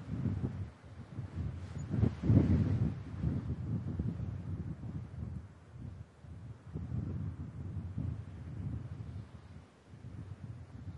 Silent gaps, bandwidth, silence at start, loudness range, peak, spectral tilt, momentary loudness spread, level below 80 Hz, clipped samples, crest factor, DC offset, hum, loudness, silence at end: none; 7.4 kHz; 0 s; 10 LU; -14 dBFS; -9.5 dB/octave; 19 LU; -50 dBFS; under 0.1%; 24 dB; under 0.1%; none; -38 LUFS; 0 s